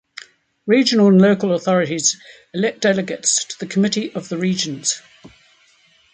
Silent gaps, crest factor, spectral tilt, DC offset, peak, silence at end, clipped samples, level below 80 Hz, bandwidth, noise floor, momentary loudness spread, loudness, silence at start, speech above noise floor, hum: none; 16 dB; -4 dB/octave; under 0.1%; -2 dBFS; 1.15 s; under 0.1%; -64 dBFS; 9.6 kHz; -55 dBFS; 16 LU; -17 LUFS; 0.65 s; 38 dB; none